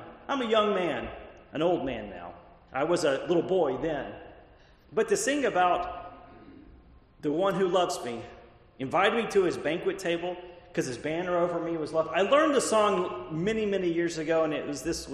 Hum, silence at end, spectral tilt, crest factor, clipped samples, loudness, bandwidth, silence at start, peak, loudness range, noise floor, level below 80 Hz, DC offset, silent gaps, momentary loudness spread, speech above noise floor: none; 0 s; -4.5 dB/octave; 20 dB; under 0.1%; -28 LUFS; 13 kHz; 0 s; -8 dBFS; 4 LU; -56 dBFS; -56 dBFS; under 0.1%; none; 15 LU; 29 dB